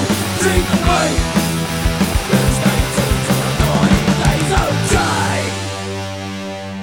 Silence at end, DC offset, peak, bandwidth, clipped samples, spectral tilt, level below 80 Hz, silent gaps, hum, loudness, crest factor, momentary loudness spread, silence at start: 0 s; 0.3%; 0 dBFS; 19 kHz; under 0.1%; -4.5 dB/octave; -24 dBFS; none; none; -16 LUFS; 16 dB; 10 LU; 0 s